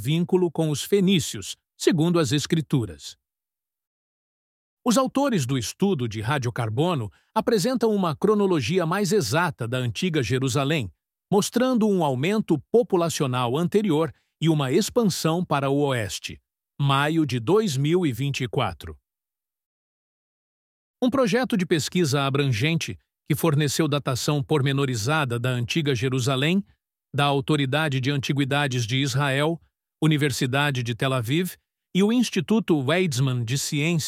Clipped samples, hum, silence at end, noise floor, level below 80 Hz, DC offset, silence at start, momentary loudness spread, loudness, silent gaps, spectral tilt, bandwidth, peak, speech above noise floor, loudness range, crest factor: under 0.1%; none; 0 s; under -90 dBFS; -58 dBFS; under 0.1%; 0 s; 6 LU; -23 LUFS; 3.87-4.77 s, 19.66-20.94 s; -5.5 dB/octave; 16 kHz; -6 dBFS; over 67 dB; 4 LU; 16 dB